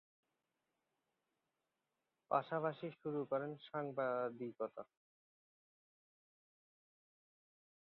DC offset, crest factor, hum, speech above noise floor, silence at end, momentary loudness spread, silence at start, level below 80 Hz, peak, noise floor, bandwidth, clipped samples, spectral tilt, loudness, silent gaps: under 0.1%; 26 dB; none; 48 dB; 3.1 s; 8 LU; 2.3 s; under -90 dBFS; -20 dBFS; -90 dBFS; 5.4 kHz; under 0.1%; -5.5 dB/octave; -42 LUFS; none